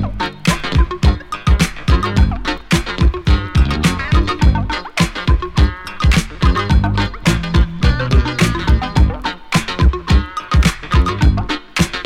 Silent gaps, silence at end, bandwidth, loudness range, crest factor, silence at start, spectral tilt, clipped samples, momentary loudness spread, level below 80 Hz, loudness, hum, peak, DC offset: none; 0 s; 13.5 kHz; 1 LU; 14 dB; 0 s; -5.5 dB/octave; under 0.1%; 4 LU; -18 dBFS; -16 LUFS; none; 0 dBFS; under 0.1%